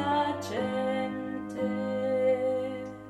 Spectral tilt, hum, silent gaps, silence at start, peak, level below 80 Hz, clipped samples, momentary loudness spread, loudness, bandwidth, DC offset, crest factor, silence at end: -6 dB/octave; none; none; 0 s; -16 dBFS; -66 dBFS; under 0.1%; 8 LU; -30 LUFS; 13 kHz; under 0.1%; 14 dB; 0 s